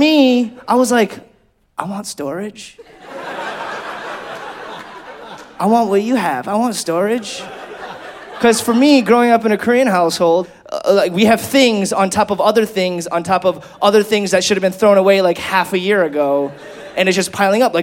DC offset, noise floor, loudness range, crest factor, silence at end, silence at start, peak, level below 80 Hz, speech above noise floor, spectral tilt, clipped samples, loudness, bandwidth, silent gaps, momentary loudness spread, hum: under 0.1%; -54 dBFS; 13 LU; 14 dB; 0 s; 0 s; 0 dBFS; -56 dBFS; 40 dB; -4 dB/octave; under 0.1%; -15 LUFS; 17 kHz; none; 19 LU; none